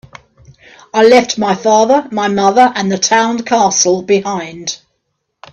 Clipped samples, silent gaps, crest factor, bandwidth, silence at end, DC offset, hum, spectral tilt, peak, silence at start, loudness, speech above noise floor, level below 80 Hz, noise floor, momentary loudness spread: under 0.1%; none; 12 dB; 9.4 kHz; 0.75 s; under 0.1%; none; -3 dB/octave; 0 dBFS; 0.95 s; -12 LUFS; 57 dB; -56 dBFS; -69 dBFS; 12 LU